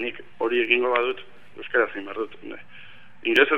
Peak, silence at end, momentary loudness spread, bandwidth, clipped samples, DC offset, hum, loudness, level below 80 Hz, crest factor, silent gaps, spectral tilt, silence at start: -4 dBFS; 0 s; 20 LU; 6.8 kHz; under 0.1%; 0.9%; none; -24 LUFS; -70 dBFS; 22 dB; none; -4.5 dB/octave; 0 s